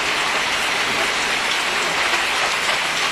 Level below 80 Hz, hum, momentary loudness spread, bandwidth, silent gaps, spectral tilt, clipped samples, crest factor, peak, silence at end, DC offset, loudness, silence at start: -50 dBFS; none; 1 LU; 14 kHz; none; -0.5 dB/octave; under 0.1%; 14 dB; -6 dBFS; 0 s; under 0.1%; -18 LUFS; 0 s